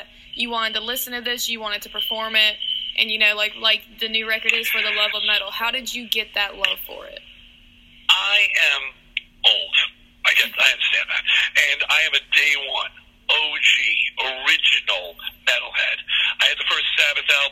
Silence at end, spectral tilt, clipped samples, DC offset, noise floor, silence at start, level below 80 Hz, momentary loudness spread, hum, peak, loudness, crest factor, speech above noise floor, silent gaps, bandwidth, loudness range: 0 s; 1 dB/octave; under 0.1%; under 0.1%; -49 dBFS; 0 s; -56 dBFS; 10 LU; none; 0 dBFS; -18 LUFS; 22 dB; 28 dB; none; 17 kHz; 4 LU